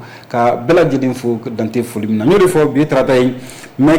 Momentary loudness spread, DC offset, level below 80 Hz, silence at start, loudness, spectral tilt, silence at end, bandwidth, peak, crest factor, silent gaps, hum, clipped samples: 9 LU; under 0.1%; -42 dBFS; 0 s; -14 LUFS; -6.5 dB/octave; 0 s; 19 kHz; -4 dBFS; 8 dB; none; none; under 0.1%